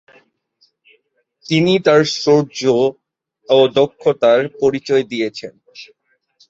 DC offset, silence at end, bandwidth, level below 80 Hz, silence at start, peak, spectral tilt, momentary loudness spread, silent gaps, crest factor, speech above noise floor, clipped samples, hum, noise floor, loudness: under 0.1%; 0.65 s; 7.8 kHz; -60 dBFS; 1.5 s; -2 dBFS; -5.5 dB/octave; 9 LU; none; 16 dB; 47 dB; under 0.1%; none; -61 dBFS; -15 LUFS